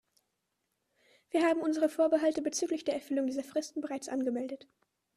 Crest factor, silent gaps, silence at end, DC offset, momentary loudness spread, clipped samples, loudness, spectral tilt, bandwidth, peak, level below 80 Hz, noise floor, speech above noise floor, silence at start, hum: 16 dB; none; 0.6 s; under 0.1%; 10 LU; under 0.1%; -32 LUFS; -3 dB/octave; 14 kHz; -16 dBFS; -78 dBFS; -82 dBFS; 51 dB; 1.35 s; none